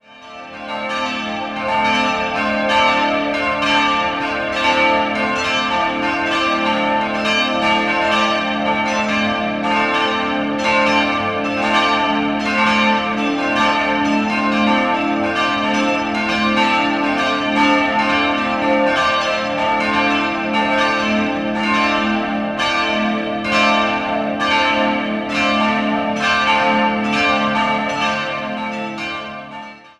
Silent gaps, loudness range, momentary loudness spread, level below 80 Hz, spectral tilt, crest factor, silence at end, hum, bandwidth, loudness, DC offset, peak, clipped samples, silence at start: none; 1 LU; 6 LU; -46 dBFS; -4 dB/octave; 16 dB; 0.1 s; none; 11.5 kHz; -16 LUFS; under 0.1%; -2 dBFS; under 0.1%; 0.1 s